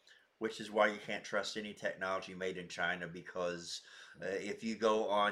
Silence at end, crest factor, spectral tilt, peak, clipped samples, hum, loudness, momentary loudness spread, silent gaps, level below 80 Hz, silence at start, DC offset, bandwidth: 0 s; 22 dB; -3.5 dB/octave; -16 dBFS; under 0.1%; none; -38 LUFS; 11 LU; none; -78 dBFS; 0.1 s; under 0.1%; 13.5 kHz